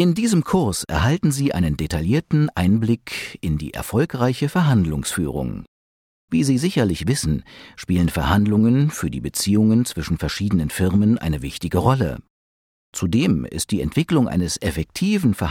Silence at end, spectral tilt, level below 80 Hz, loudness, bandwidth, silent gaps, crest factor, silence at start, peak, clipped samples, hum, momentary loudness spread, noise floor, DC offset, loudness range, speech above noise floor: 0 s; -6 dB/octave; -38 dBFS; -20 LUFS; 16.5 kHz; 5.68-6.28 s, 12.30-12.93 s; 16 dB; 0 s; -4 dBFS; under 0.1%; none; 8 LU; under -90 dBFS; under 0.1%; 3 LU; over 71 dB